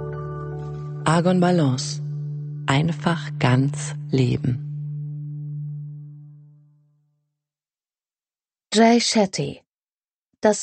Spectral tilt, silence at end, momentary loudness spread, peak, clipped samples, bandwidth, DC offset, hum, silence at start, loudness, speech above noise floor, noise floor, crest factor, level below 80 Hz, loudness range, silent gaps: -5.5 dB/octave; 0 s; 14 LU; -4 dBFS; under 0.1%; 8.8 kHz; under 0.1%; none; 0 s; -22 LUFS; over 70 dB; under -90 dBFS; 20 dB; -54 dBFS; 15 LU; 9.75-9.79 s, 9.92-10.01 s, 10.13-10.30 s